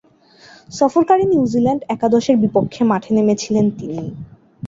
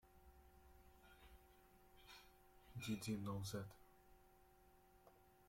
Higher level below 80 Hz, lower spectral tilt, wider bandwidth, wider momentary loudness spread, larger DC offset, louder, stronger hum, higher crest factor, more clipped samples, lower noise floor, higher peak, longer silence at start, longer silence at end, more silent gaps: first, -52 dBFS vs -72 dBFS; first, -6.5 dB/octave vs -5 dB/octave; second, 7.8 kHz vs 16.5 kHz; second, 13 LU vs 23 LU; neither; first, -16 LUFS vs -49 LUFS; neither; about the same, 16 dB vs 20 dB; neither; second, -47 dBFS vs -71 dBFS; first, -2 dBFS vs -34 dBFS; first, 0.7 s vs 0.05 s; about the same, 0 s vs 0 s; neither